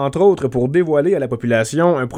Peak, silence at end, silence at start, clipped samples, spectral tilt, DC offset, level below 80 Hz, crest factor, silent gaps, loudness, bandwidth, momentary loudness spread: -2 dBFS; 0 s; 0 s; under 0.1%; -6.5 dB/octave; under 0.1%; -48 dBFS; 14 dB; none; -16 LUFS; 13.5 kHz; 4 LU